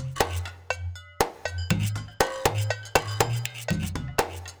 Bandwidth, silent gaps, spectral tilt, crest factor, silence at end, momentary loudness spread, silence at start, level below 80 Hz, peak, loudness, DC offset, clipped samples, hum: over 20 kHz; none; -4 dB/octave; 24 dB; 0 s; 8 LU; 0 s; -44 dBFS; -4 dBFS; -28 LUFS; under 0.1%; under 0.1%; none